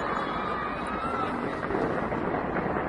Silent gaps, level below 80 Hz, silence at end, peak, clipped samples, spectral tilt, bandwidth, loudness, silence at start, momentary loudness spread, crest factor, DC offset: none; -48 dBFS; 0 s; -14 dBFS; under 0.1%; -7 dB/octave; 11.5 kHz; -30 LUFS; 0 s; 2 LU; 16 dB; under 0.1%